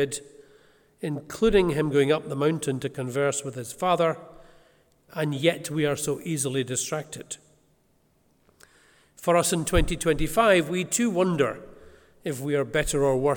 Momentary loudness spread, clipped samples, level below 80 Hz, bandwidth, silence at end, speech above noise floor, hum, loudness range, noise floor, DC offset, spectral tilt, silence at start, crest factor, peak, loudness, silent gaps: 13 LU; under 0.1%; -42 dBFS; 19 kHz; 0 s; 41 dB; none; 6 LU; -65 dBFS; under 0.1%; -4.5 dB/octave; 0 s; 20 dB; -6 dBFS; -25 LUFS; none